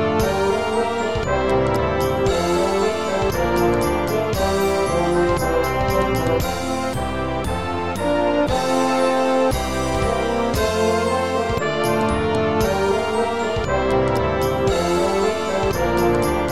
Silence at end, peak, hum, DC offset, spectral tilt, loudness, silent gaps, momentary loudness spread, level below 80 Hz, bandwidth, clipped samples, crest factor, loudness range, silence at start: 0 s; -6 dBFS; none; 1%; -5.5 dB/octave; -20 LUFS; none; 4 LU; -34 dBFS; 16.5 kHz; under 0.1%; 14 dB; 1 LU; 0 s